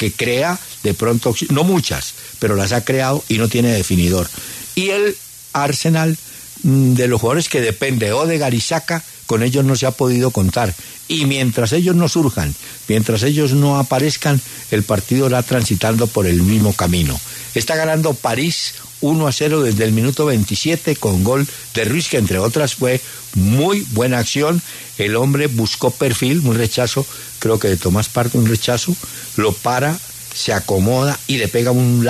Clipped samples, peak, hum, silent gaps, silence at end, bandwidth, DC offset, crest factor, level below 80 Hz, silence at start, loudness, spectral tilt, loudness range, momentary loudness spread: under 0.1%; -2 dBFS; none; none; 0 s; 14 kHz; under 0.1%; 14 dB; -40 dBFS; 0 s; -16 LUFS; -5 dB/octave; 2 LU; 7 LU